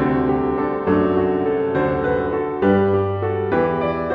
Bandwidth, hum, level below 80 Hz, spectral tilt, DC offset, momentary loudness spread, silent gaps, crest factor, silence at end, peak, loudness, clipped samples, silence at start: 5.2 kHz; none; -42 dBFS; -10 dB/octave; under 0.1%; 4 LU; none; 14 dB; 0 s; -4 dBFS; -19 LUFS; under 0.1%; 0 s